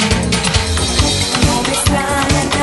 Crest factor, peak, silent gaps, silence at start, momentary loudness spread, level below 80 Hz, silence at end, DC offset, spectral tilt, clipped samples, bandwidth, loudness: 14 dB; 0 dBFS; none; 0 s; 1 LU; -24 dBFS; 0 s; under 0.1%; -3.5 dB/octave; under 0.1%; 12 kHz; -14 LUFS